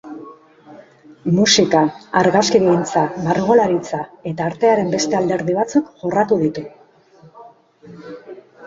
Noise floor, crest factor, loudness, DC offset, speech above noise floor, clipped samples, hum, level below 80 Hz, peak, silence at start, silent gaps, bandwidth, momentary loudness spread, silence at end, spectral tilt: -48 dBFS; 18 dB; -17 LUFS; under 0.1%; 32 dB; under 0.1%; none; -56 dBFS; 0 dBFS; 0.05 s; none; 7.8 kHz; 21 LU; 0 s; -4.5 dB/octave